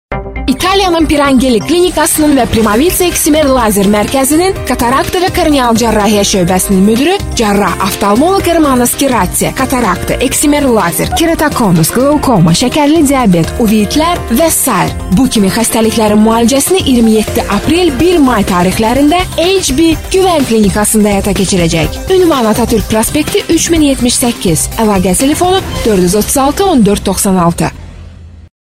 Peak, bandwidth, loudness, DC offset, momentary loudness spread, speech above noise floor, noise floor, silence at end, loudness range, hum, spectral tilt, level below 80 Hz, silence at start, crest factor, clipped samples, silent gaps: 0 dBFS; 16.5 kHz; -9 LUFS; 0.4%; 3 LU; 22 dB; -30 dBFS; 0.2 s; 1 LU; none; -4.5 dB/octave; -26 dBFS; 0.1 s; 8 dB; under 0.1%; none